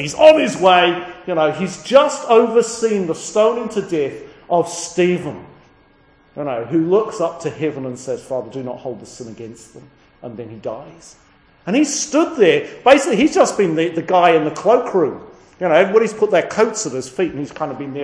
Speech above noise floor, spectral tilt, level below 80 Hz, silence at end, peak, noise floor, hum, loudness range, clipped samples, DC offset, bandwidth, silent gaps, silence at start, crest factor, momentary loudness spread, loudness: 36 dB; -4.5 dB/octave; -56 dBFS; 0 s; 0 dBFS; -52 dBFS; none; 13 LU; under 0.1%; under 0.1%; 10.5 kHz; none; 0 s; 18 dB; 18 LU; -16 LUFS